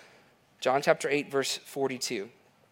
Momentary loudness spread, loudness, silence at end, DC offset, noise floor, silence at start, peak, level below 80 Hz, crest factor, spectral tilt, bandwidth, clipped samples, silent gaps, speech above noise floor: 8 LU; -29 LUFS; 0.45 s; under 0.1%; -61 dBFS; 0.6 s; -8 dBFS; -82 dBFS; 24 dB; -3 dB/octave; 16.5 kHz; under 0.1%; none; 32 dB